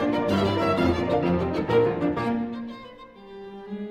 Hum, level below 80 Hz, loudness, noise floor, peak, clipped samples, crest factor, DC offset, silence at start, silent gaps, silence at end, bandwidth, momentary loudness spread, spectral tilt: none; -48 dBFS; -24 LUFS; -44 dBFS; -10 dBFS; under 0.1%; 16 dB; under 0.1%; 0 s; none; 0 s; 14 kHz; 19 LU; -7.5 dB/octave